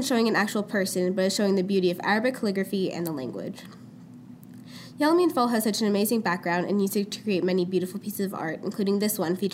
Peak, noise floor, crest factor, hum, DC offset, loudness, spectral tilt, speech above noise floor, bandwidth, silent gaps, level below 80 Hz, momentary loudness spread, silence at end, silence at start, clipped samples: -10 dBFS; -45 dBFS; 16 dB; none; under 0.1%; -26 LUFS; -5 dB/octave; 20 dB; 16 kHz; none; -76 dBFS; 19 LU; 0 s; 0 s; under 0.1%